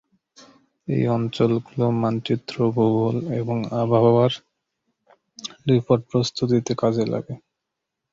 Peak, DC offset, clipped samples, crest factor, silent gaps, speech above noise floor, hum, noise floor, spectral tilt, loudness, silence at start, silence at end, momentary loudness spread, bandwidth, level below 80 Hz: -4 dBFS; under 0.1%; under 0.1%; 18 dB; none; 61 dB; none; -82 dBFS; -7 dB/octave; -22 LUFS; 0.9 s; 0.75 s; 11 LU; 7.6 kHz; -58 dBFS